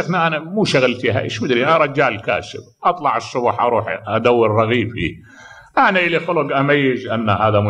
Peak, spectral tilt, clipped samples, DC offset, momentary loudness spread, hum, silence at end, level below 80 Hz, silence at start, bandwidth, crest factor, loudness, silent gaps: -2 dBFS; -6 dB/octave; under 0.1%; under 0.1%; 7 LU; none; 0 s; -50 dBFS; 0 s; 10 kHz; 16 dB; -17 LUFS; none